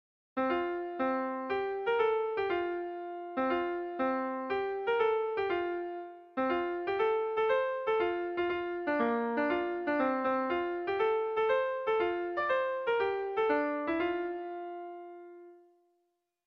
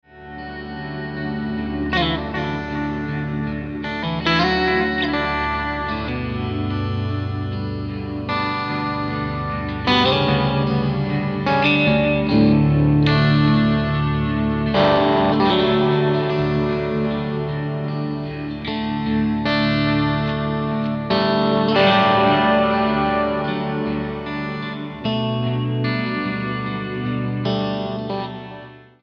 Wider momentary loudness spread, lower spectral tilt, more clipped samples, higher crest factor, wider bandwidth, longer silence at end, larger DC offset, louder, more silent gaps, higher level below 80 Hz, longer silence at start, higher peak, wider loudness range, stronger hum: about the same, 10 LU vs 11 LU; second, -6.5 dB/octave vs -8 dB/octave; neither; about the same, 14 dB vs 18 dB; second, 5.8 kHz vs 6.6 kHz; first, 0.9 s vs 0.2 s; neither; second, -32 LUFS vs -20 LUFS; neither; second, -68 dBFS vs -38 dBFS; first, 0.35 s vs 0.15 s; second, -18 dBFS vs -2 dBFS; second, 2 LU vs 7 LU; neither